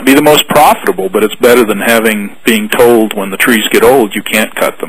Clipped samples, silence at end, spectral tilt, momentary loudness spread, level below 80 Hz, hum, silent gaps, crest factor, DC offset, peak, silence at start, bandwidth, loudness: 3%; 0 s; -3.5 dB/octave; 7 LU; -42 dBFS; none; none; 8 dB; 3%; 0 dBFS; 0 s; over 20 kHz; -8 LUFS